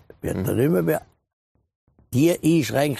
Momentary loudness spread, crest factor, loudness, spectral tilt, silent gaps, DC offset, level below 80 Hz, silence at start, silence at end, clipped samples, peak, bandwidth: 8 LU; 18 dB; -22 LUFS; -6.5 dB/octave; 1.33-1.55 s, 1.75-1.87 s; under 0.1%; -52 dBFS; 0.25 s; 0 s; under 0.1%; -6 dBFS; 15 kHz